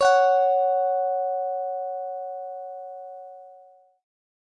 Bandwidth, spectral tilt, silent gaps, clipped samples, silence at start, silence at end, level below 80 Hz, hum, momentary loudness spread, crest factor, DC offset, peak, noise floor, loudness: 10.5 kHz; 0 dB/octave; none; under 0.1%; 0 s; 0.9 s; -78 dBFS; none; 20 LU; 18 dB; under 0.1%; -8 dBFS; -53 dBFS; -24 LUFS